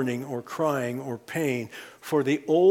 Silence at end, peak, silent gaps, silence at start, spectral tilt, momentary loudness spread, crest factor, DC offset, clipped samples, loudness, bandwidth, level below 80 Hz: 0 s; -10 dBFS; none; 0 s; -6 dB/octave; 10 LU; 16 dB; under 0.1%; under 0.1%; -27 LUFS; 17 kHz; -72 dBFS